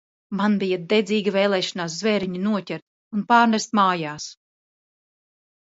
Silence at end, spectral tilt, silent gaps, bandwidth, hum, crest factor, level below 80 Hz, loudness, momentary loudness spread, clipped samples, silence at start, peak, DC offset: 1.35 s; -5 dB/octave; 2.82-3.11 s; 8 kHz; none; 20 dB; -68 dBFS; -22 LUFS; 15 LU; under 0.1%; 0.3 s; -4 dBFS; under 0.1%